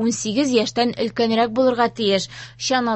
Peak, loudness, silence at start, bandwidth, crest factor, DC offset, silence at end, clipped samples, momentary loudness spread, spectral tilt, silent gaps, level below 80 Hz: -4 dBFS; -20 LUFS; 0 s; 8.6 kHz; 16 dB; under 0.1%; 0 s; under 0.1%; 4 LU; -3.5 dB/octave; none; -58 dBFS